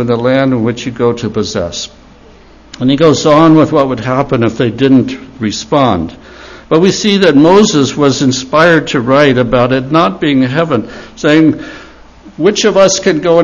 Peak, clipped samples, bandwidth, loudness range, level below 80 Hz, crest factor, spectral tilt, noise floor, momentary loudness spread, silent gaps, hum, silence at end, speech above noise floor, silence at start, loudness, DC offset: 0 dBFS; 0.6%; 7.4 kHz; 4 LU; -40 dBFS; 10 dB; -5 dB/octave; -38 dBFS; 11 LU; none; none; 0 s; 29 dB; 0 s; -10 LUFS; under 0.1%